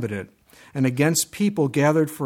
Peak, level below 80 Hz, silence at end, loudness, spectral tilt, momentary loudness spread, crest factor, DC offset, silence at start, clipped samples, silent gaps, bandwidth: -6 dBFS; -62 dBFS; 0 s; -21 LUFS; -5 dB/octave; 12 LU; 16 dB; under 0.1%; 0 s; under 0.1%; none; 17 kHz